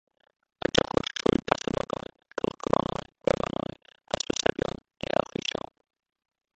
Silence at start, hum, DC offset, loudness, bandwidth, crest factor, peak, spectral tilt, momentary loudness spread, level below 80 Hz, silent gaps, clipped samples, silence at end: 0.75 s; none; under 0.1%; -29 LUFS; 8.8 kHz; 30 dB; 0 dBFS; -4 dB/octave; 11 LU; -52 dBFS; none; under 0.1%; 5 s